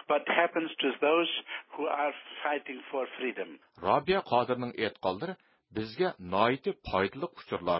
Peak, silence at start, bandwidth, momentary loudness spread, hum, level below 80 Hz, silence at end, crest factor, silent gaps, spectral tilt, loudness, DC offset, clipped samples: -10 dBFS; 0.1 s; 5.8 kHz; 12 LU; none; -60 dBFS; 0 s; 22 dB; none; -9 dB/octave; -31 LUFS; under 0.1%; under 0.1%